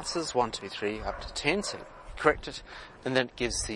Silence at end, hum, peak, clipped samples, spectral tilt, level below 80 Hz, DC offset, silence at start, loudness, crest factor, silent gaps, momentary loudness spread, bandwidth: 0 s; none; -6 dBFS; under 0.1%; -3 dB/octave; -48 dBFS; under 0.1%; 0 s; -30 LUFS; 26 dB; none; 14 LU; 11.5 kHz